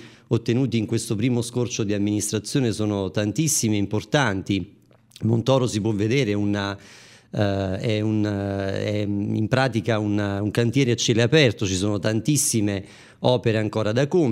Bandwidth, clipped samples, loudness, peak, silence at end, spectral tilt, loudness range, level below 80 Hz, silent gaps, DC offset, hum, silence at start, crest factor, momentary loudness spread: 16 kHz; under 0.1%; -23 LUFS; -2 dBFS; 0 s; -5 dB/octave; 3 LU; -58 dBFS; none; under 0.1%; none; 0 s; 20 dB; 6 LU